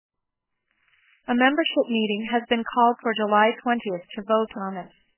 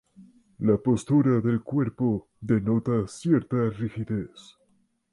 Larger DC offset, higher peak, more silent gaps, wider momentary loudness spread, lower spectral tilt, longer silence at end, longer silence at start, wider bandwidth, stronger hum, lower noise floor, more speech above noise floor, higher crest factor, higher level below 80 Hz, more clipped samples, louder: neither; first, -4 dBFS vs -10 dBFS; neither; first, 13 LU vs 10 LU; about the same, -8.5 dB/octave vs -8.5 dB/octave; second, 0.3 s vs 0.7 s; first, 1.3 s vs 0.2 s; second, 3.2 kHz vs 11.5 kHz; neither; first, -82 dBFS vs -68 dBFS; first, 60 dB vs 43 dB; about the same, 20 dB vs 16 dB; second, -68 dBFS vs -54 dBFS; neither; first, -23 LUFS vs -26 LUFS